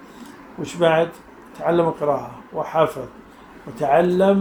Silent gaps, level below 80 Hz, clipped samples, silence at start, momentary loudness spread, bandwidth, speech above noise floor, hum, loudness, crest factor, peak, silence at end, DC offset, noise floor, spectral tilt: none; -56 dBFS; under 0.1%; 0 s; 22 LU; 20 kHz; 21 dB; none; -20 LUFS; 20 dB; -2 dBFS; 0 s; under 0.1%; -41 dBFS; -6.5 dB/octave